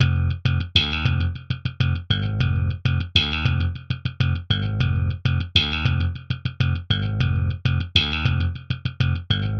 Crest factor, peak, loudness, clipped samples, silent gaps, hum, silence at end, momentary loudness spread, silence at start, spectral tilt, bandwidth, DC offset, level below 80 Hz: 22 dB; 0 dBFS; -22 LUFS; under 0.1%; none; none; 0 s; 7 LU; 0 s; -6 dB/octave; 6.6 kHz; under 0.1%; -34 dBFS